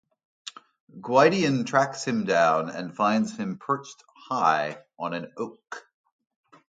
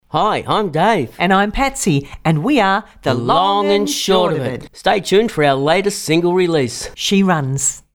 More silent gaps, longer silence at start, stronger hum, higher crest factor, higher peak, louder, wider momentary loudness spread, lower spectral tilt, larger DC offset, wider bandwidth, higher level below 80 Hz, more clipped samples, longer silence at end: first, 0.80-0.87 s vs none; first, 0.45 s vs 0.15 s; neither; first, 22 dB vs 14 dB; about the same, -4 dBFS vs -2 dBFS; second, -25 LUFS vs -16 LUFS; first, 21 LU vs 5 LU; about the same, -5 dB/octave vs -4.5 dB/octave; neither; second, 9.2 kHz vs 19 kHz; second, -72 dBFS vs -40 dBFS; neither; first, 0.95 s vs 0.15 s